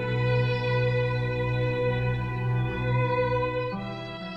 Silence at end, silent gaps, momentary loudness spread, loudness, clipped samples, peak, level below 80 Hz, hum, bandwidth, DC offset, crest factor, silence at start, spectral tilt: 0 s; none; 6 LU; -27 LUFS; under 0.1%; -14 dBFS; -44 dBFS; 60 Hz at -45 dBFS; 5.8 kHz; under 0.1%; 12 dB; 0 s; -8.5 dB/octave